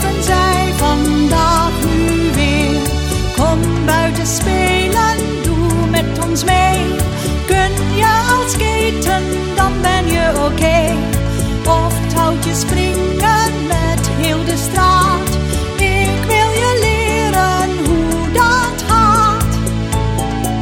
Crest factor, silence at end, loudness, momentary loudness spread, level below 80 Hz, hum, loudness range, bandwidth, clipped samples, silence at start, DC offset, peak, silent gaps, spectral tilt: 14 dB; 0 s; -14 LUFS; 5 LU; -22 dBFS; none; 1 LU; 19.5 kHz; under 0.1%; 0 s; under 0.1%; 0 dBFS; none; -4.5 dB/octave